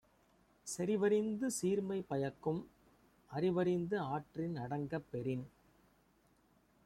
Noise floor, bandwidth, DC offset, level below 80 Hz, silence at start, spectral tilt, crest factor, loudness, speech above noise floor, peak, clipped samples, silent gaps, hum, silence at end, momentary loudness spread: -72 dBFS; 14.5 kHz; under 0.1%; -72 dBFS; 0.65 s; -6 dB/octave; 16 dB; -38 LUFS; 35 dB; -22 dBFS; under 0.1%; none; none; 1.4 s; 10 LU